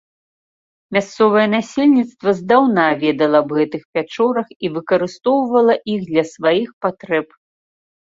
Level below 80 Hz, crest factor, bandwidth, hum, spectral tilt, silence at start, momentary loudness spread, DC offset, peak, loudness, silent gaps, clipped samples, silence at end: -62 dBFS; 16 dB; 7.8 kHz; none; -6 dB/octave; 0.9 s; 8 LU; under 0.1%; -2 dBFS; -17 LUFS; 3.85-3.93 s, 4.56-4.60 s, 6.73-6.81 s; under 0.1%; 0.85 s